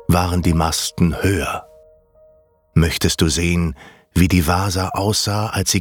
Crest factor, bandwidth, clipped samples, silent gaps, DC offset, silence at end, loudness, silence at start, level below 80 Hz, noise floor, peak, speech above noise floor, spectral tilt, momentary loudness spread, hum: 16 dB; 19.5 kHz; under 0.1%; none; under 0.1%; 0 s; -18 LUFS; 0.1 s; -34 dBFS; -54 dBFS; -2 dBFS; 37 dB; -4.5 dB/octave; 6 LU; none